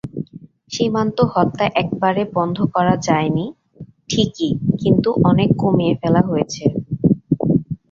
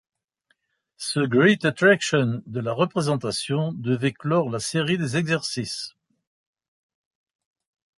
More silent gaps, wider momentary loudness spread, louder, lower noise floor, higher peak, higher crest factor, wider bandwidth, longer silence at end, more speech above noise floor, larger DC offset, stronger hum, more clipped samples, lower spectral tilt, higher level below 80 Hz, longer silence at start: neither; second, 6 LU vs 11 LU; first, -18 LUFS vs -23 LUFS; second, -41 dBFS vs -70 dBFS; first, 0 dBFS vs -4 dBFS; about the same, 18 dB vs 20 dB; second, 7.6 kHz vs 11.5 kHz; second, 0.15 s vs 2.1 s; second, 24 dB vs 48 dB; neither; neither; neither; first, -6.5 dB/octave vs -5 dB/octave; first, -46 dBFS vs -64 dBFS; second, 0.05 s vs 1 s